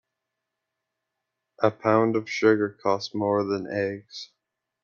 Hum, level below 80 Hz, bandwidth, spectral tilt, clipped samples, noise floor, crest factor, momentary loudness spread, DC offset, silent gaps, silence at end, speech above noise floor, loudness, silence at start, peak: none; -70 dBFS; 7.2 kHz; -6 dB/octave; under 0.1%; -83 dBFS; 20 dB; 16 LU; under 0.1%; none; 0.6 s; 59 dB; -25 LUFS; 1.6 s; -6 dBFS